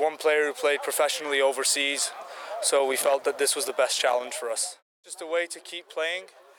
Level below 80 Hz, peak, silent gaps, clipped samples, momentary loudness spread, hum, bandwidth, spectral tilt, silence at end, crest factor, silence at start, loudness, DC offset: -88 dBFS; -12 dBFS; 4.82-5.03 s; under 0.1%; 12 LU; none; 19 kHz; 1 dB/octave; 0.3 s; 14 dB; 0 s; -25 LUFS; under 0.1%